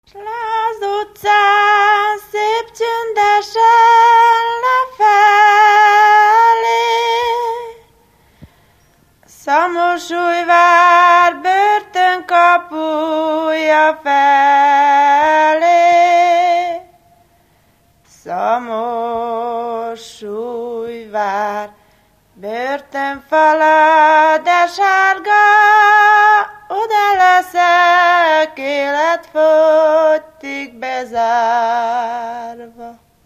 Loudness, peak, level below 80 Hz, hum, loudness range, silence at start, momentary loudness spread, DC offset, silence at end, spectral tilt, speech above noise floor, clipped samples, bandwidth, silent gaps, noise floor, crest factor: -12 LUFS; 0 dBFS; -60 dBFS; none; 11 LU; 0.15 s; 15 LU; under 0.1%; 0.35 s; -2 dB/octave; 42 dB; under 0.1%; 15 kHz; none; -54 dBFS; 12 dB